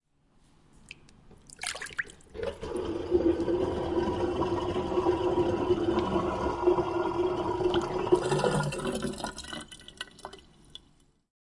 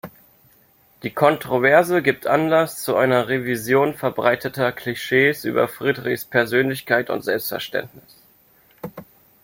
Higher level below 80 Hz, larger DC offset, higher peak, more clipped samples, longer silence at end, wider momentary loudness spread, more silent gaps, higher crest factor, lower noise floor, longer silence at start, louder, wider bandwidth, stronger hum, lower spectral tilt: first, -50 dBFS vs -60 dBFS; neither; second, -10 dBFS vs -2 dBFS; neither; first, 1.05 s vs 0.4 s; first, 19 LU vs 11 LU; neither; about the same, 20 dB vs 20 dB; first, -64 dBFS vs -56 dBFS; first, 0.9 s vs 0.05 s; second, -30 LUFS vs -20 LUFS; second, 11.5 kHz vs 17 kHz; neither; about the same, -5.5 dB/octave vs -5 dB/octave